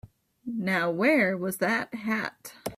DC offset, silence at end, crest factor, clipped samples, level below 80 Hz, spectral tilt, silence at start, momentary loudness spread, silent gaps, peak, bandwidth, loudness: under 0.1%; 0 s; 18 dB; under 0.1%; -66 dBFS; -5.5 dB/octave; 0.05 s; 14 LU; none; -10 dBFS; 16 kHz; -27 LUFS